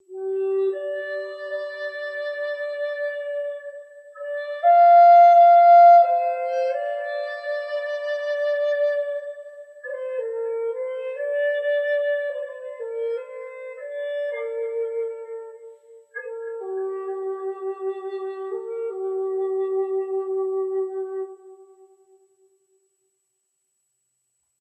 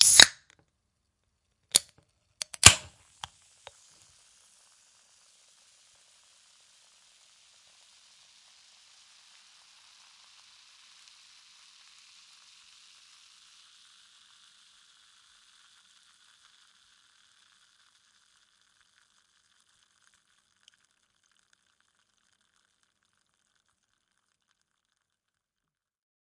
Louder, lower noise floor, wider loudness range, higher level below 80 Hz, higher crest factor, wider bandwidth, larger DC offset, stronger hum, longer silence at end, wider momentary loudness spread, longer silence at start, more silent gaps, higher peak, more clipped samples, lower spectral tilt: about the same, -21 LUFS vs -19 LUFS; second, -74 dBFS vs -88 dBFS; second, 16 LU vs 30 LU; second, under -90 dBFS vs -58 dBFS; second, 16 dB vs 34 dB; second, 5.6 kHz vs 12 kHz; neither; neither; second, 2.95 s vs 23.45 s; second, 22 LU vs 30 LU; about the same, 0.1 s vs 0 s; neither; second, -6 dBFS vs 0 dBFS; neither; first, -2.5 dB/octave vs 0.5 dB/octave